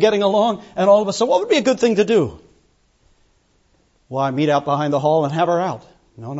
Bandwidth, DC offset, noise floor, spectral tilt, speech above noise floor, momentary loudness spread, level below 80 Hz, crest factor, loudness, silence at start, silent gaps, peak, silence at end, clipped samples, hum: 8 kHz; under 0.1%; -60 dBFS; -5.5 dB/octave; 43 dB; 10 LU; -58 dBFS; 16 dB; -18 LUFS; 0 s; none; -2 dBFS; 0 s; under 0.1%; none